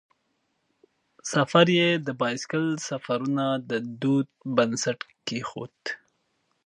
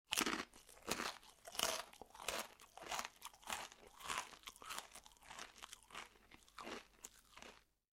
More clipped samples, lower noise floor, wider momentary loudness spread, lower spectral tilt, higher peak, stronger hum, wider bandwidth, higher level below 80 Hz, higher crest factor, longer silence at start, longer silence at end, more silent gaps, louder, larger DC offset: neither; first, -74 dBFS vs -67 dBFS; about the same, 16 LU vs 18 LU; first, -4.5 dB/octave vs -0.5 dB/octave; first, -4 dBFS vs -16 dBFS; neither; second, 11 kHz vs 16 kHz; about the same, -72 dBFS vs -72 dBFS; second, 24 dB vs 32 dB; first, 1.25 s vs 0.1 s; first, 0.7 s vs 0.4 s; neither; first, -26 LUFS vs -47 LUFS; neither